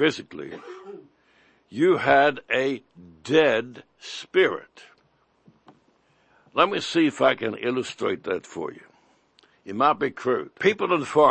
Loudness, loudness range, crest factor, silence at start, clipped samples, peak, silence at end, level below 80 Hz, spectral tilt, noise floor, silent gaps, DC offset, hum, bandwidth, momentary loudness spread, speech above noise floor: -23 LUFS; 4 LU; 22 dB; 0 s; under 0.1%; -4 dBFS; 0 s; -70 dBFS; -5 dB/octave; -65 dBFS; none; under 0.1%; none; 8.8 kHz; 19 LU; 42 dB